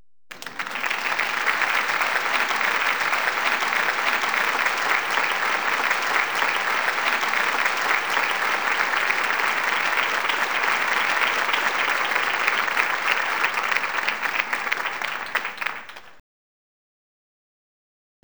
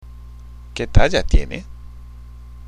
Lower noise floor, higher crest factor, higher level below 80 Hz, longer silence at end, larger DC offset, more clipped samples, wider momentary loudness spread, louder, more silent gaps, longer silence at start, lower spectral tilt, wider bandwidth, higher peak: first, under -90 dBFS vs -37 dBFS; about the same, 22 dB vs 18 dB; second, -74 dBFS vs -22 dBFS; first, 2.15 s vs 0.1 s; first, 0.5% vs under 0.1%; neither; second, 5 LU vs 24 LU; about the same, -21 LUFS vs -20 LUFS; neither; first, 0.3 s vs 0.05 s; second, 0 dB/octave vs -5.5 dB/octave; first, over 20 kHz vs 9.4 kHz; about the same, -2 dBFS vs 0 dBFS